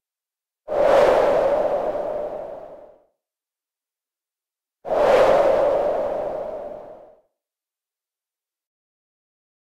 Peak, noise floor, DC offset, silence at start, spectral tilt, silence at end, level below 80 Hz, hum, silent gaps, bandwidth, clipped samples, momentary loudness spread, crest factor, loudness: -6 dBFS; under -90 dBFS; under 0.1%; 0.7 s; -5 dB/octave; 2.7 s; -52 dBFS; none; none; 12.5 kHz; under 0.1%; 20 LU; 18 dB; -20 LUFS